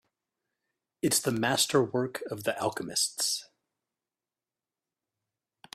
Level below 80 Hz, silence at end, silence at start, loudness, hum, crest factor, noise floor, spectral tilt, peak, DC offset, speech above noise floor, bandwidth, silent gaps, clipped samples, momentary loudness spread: -72 dBFS; 2.3 s; 1.05 s; -28 LUFS; none; 22 dB; under -90 dBFS; -3 dB/octave; -10 dBFS; under 0.1%; over 61 dB; 16 kHz; none; under 0.1%; 8 LU